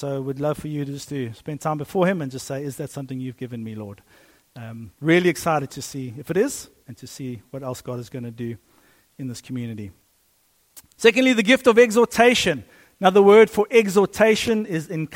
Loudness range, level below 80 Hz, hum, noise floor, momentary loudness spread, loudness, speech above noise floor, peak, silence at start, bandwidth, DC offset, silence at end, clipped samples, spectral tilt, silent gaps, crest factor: 17 LU; -58 dBFS; none; -63 dBFS; 19 LU; -20 LUFS; 42 dB; -2 dBFS; 0 s; 16.5 kHz; under 0.1%; 0 s; under 0.1%; -5 dB/octave; none; 20 dB